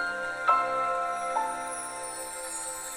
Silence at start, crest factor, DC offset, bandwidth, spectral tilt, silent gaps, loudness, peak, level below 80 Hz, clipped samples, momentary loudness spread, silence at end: 0 s; 22 dB; under 0.1%; over 20 kHz; -1 dB/octave; none; -30 LUFS; -10 dBFS; -62 dBFS; under 0.1%; 10 LU; 0 s